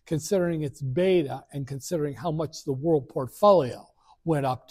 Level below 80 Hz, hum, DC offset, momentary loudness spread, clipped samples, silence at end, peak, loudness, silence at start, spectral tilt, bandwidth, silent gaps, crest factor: -58 dBFS; none; under 0.1%; 14 LU; under 0.1%; 0.15 s; -8 dBFS; -26 LUFS; 0.1 s; -6.5 dB/octave; 15.5 kHz; none; 18 dB